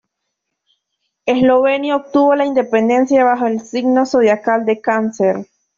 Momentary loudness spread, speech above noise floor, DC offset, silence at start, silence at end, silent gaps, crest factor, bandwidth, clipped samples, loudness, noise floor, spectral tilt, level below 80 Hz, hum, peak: 6 LU; 62 dB; under 0.1%; 1.25 s; 0.35 s; none; 12 dB; 7.4 kHz; under 0.1%; -15 LUFS; -75 dBFS; -5.5 dB/octave; -60 dBFS; none; -2 dBFS